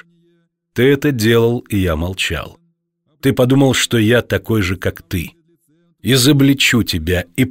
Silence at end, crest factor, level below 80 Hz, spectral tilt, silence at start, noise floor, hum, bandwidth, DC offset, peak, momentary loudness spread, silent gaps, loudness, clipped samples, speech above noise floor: 0 s; 14 dB; -38 dBFS; -5 dB/octave; 0.75 s; -64 dBFS; none; 16.5 kHz; under 0.1%; -2 dBFS; 13 LU; none; -15 LUFS; under 0.1%; 50 dB